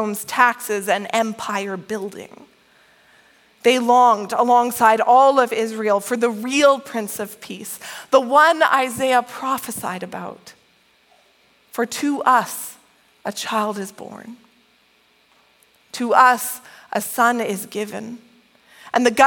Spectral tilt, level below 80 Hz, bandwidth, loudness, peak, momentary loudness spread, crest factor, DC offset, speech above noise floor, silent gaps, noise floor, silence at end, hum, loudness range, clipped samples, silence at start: -3 dB/octave; -70 dBFS; 17.5 kHz; -18 LUFS; 0 dBFS; 19 LU; 20 dB; under 0.1%; 40 dB; none; -58 dBFS; 0 s; none; 9 LU; under 0.1%; 0 s